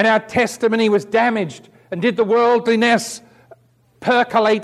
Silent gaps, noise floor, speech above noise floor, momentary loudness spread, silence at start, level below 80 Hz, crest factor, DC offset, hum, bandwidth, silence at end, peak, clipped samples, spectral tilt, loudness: none; -51 dBFS; 34 dB; 12 LU; 0 s; -60 dBFS; 14 dB; under 0.1%; none; 13.5 kHz; 0 s; -4 dBFS; under 0.1%; -4.5 dB/octave; -17 LUFS